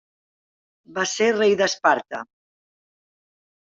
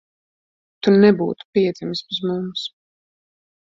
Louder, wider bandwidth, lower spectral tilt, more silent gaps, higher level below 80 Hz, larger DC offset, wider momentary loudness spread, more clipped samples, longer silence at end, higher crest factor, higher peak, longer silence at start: about the same, -20 LUFS vs -19 LUFS; about the same, 7.8 kHz vs 7.4 kHz; second, -3 dB/octave vs -7 dB/octave; second, none vs 1.45-1.53 s; second, -72 dBFS vs -62 dBFS; neither; about the same, 15 LU vs 14 LU; neither; first, 1.45 s vs 0.95 s; about the same, 20 dB vs 18 dB; about the same, -4 dBFS vs -2 dBFS; about the same, 0.9 s vs 0.85 s